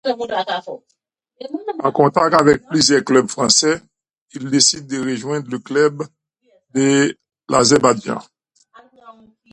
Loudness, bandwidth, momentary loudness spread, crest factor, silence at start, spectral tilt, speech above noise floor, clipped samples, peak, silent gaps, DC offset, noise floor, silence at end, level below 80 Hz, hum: -16 LUFS; 11.5 kHz; 18 LU; 18 dB; 0.05 s; -3.5 dB/octave; 44 dB; under 0.1%; 0 dBFS; 4.21-4.26 s; under 0.1%; -60 dBFS; 0.4 s; -56 dBFS; none